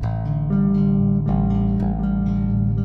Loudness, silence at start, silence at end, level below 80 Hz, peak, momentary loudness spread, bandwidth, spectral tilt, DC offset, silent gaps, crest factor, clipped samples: -20 LUFS; 0 s; 0 s; -28 dBFS; -8 dBFS; 4 LU; 4.3 kHz; -12 dB/octave; under 0.1%; none; 12 dB; under 0.1%